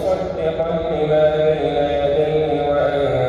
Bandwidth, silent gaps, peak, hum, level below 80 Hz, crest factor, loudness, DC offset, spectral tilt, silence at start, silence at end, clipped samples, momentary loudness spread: 7.4 kHz; none; -6 dBFS; none; -40 dBFS; 12 dB; -18 LUFS; under 0.1%; -7.5 dB/octave; 0 s; 0 s; under 0.1%; 5 LU